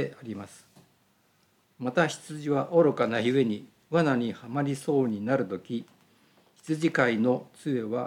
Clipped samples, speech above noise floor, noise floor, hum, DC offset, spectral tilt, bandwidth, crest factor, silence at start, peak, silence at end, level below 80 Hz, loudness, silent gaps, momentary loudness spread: under 0.1%; 40 dB; -67 dBFS; none; under 0.1%; -6.5 dB/octave; 14 kHz; 20 dB; 0 s; -8 dBFS; 0 s; -80 dBFS; -28 LUFS; none; 13 LU